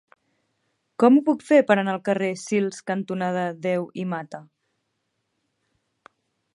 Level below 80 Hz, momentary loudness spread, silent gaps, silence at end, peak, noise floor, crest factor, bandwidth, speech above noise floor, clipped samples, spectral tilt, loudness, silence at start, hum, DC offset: -76 dBFS; 13 LU; none; 2.1 s; -4 dBFS; -76 dBFS; 22 dB; 11.5 kHz; 54 dB; under 0.1%; -6.5 dB/octave; -22 LUFS; 1 s; none; under 0.1%